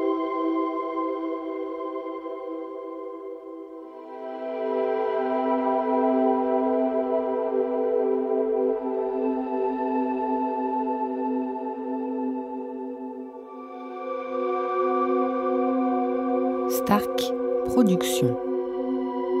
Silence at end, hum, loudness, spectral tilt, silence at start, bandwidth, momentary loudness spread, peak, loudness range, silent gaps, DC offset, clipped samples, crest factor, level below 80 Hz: 0 s; none; -26 LUFS; -6 dB/octave; 0 s; 16 kHz; 13 LU; -8 dBFS; 8 LU; none; under 0.1%; under 0.1%; 18 dB; -62 dBFS